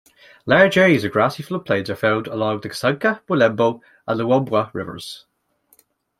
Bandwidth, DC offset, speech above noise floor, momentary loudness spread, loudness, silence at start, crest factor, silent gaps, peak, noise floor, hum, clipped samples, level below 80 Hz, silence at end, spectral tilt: 15.5 kHz; under 0.1%; 42 dB; 16 LU; -19 LUFS; 0.45 s; 18 dB; none; -2 dBFS; -61 dBFS; none; under 0.1%; -60 dBFS; 1 s; -6 dB/octave